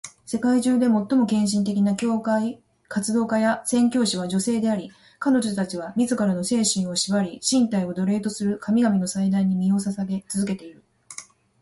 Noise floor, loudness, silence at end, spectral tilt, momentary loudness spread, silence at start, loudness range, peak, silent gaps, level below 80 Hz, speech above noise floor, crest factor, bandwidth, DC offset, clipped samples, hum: -44 dBFS; -23 LUFS; 0.4 s; -5 dB/octave; 8 LU; 0.05 s; 1 LU; -8 dBFS; none; -62 dBFS; 22 dB; 14 dB; 12 kHz; under 0.1%; under 0.1%; none